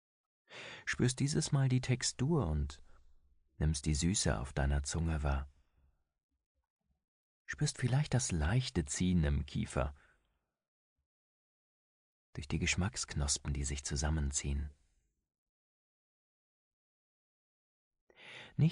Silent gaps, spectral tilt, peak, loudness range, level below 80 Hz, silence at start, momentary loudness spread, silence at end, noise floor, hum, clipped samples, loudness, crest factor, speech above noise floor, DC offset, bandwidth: 6.23-6.29 s, 6.46-6.55 s, 6.70-6.77 s, 7.08-7.45 s, 10.68-10.96 s, 11.06-12.33 s, 15.38-17.91 s, 18.01-18.07 s; -4.5 dB/octave; -18 dBFS; 7 LU; -44 dBFS; 0.5 s; 12 LU; 0 s; -82 dBFS; none; under 0.1%; -35 LUFS; 18 dB; 48 dB; under 0.1%; 10.5 kHz